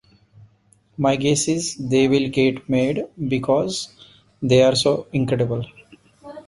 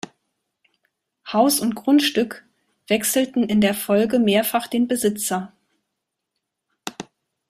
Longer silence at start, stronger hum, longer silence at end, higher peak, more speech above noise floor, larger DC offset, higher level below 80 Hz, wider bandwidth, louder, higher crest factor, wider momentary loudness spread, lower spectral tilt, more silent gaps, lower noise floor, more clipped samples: second, 1 s vs 1.25 s; neither; second, 0.05 s vs 0.5 s; about the same, -4 dBFS vs -4 dBFS; second, 39 dB vs 61 dB; neither; first, -54 dBFS vs -62 dBFS; second, 11.5 kHz vs 16 kHz; about the same, -20 LUFS vs -20 LUFS; about the same, 16 dB vs 18 dB; second, 12 LU vs 21 LU; about the same, -5 dB/octave vs -4 dB/octave; neither; second, -58 dBFS vs -80 dBFS; neither